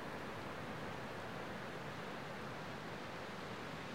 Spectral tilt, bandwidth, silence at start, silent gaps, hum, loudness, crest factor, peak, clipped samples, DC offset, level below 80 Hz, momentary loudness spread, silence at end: -5 dB/octave; 16 kHz; 0 s; none; none; -47 LUFS; 12 dB; -34 dBFS; under 0.1%; 0.1%; -70 dBFS; 1 LU; 0 s